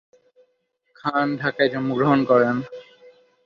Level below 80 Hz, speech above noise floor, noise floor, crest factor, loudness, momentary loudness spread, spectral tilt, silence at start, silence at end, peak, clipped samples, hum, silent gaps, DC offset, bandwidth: -64 dBFS; 50 dB; -70 dBFS; 20 dB; -21 LUFS; 13 LU; -8 dB/octave; 1.05 s; 0.35 s; -4 dBFS; under 0.1%; none; none; under 0.1%; 6.6 kHz